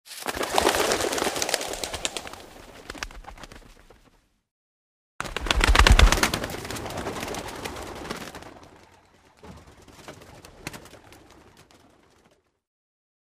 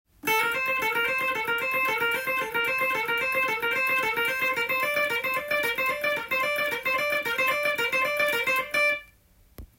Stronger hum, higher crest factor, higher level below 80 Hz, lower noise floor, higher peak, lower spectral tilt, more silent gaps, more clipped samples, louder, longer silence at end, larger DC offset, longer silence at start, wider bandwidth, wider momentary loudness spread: neither; first, 26 dB vs 14 dB; first, -30 dBFS vs -60 dBFS; first, -63 dBFS vs -58 dBFS; first, -2 dBFS vs -12 dBFS; about the same, -3 dB/octave vs -2 dB/octave; first, 4.51-5.19 s vs none; neither; about the same, -25 LUFS vs -24 LUFS; first, 2.05 s vs 0.15 s; neither; second, 0.05 s vs 0.25 s; about the same, 16 kHz vs 17 kHz; first, 27 LU vs 2 LU